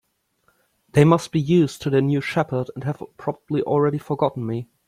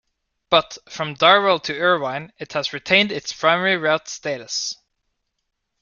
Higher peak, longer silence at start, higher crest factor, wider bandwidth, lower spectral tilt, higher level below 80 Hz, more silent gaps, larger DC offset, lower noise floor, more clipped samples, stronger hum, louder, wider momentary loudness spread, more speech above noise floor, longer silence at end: about the same, -2 dBFS vs -2 dBFS; first, 0.95 s vs 0.5 s; about the same, 18 dB vs 20 dB; first, 14.5 kHz vs 7.4 kHz; first, -7.5 dB/octave vs -3 dB/octave; first, -56 dBFS vs -62 dBFS; neither; neither; second, -66 dBFS vs -76 dBFS; neither; neither; about the same, -21 LUFS vs -19 LUFS; about the same, 12 LU vs 14 LU; second, 46 dB vs 56 dB; second, 0.25 s vs 1.1 s